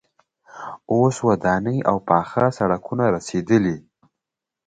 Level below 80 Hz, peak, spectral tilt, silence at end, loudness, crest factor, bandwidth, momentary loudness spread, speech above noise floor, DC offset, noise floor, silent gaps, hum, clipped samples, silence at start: -52 dBFS; 0 dBFS; -7 dB/octave; 0.85 s; -20 LUFS; 20 dB; 9.4 kHz; 12 LU; 65 dB; under 0.1%; -85 dBFS; none; none; under 0.1%; 0.55 s